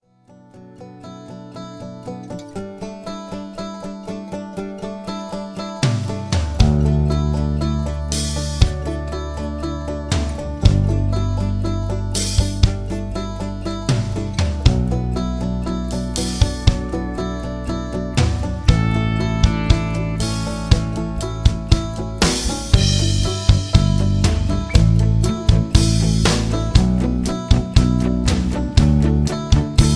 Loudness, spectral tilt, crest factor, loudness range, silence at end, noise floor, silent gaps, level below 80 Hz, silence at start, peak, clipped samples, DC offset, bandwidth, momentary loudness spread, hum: -19 LUFS; -5.5 dB/octave; 18 dB; 13 LU; 0 s; -48 dBFS; none; -22 dBFS; 0.55 s; 0 dBFS; under 0.1%; under 0.1%; 11 kHz; 14 LU; none